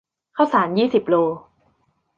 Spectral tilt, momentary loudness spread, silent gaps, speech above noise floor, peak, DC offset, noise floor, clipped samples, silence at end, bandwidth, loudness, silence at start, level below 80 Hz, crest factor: -7.5 dB/octave; 13 LU; none; 47 dB; -2 dBFS; under 0.1%; -66 dBFS; under 0.1%; 0.8 s; 7.2 kHz; -19 LUFS; 0.35 s; -64 dBFS; 18 dB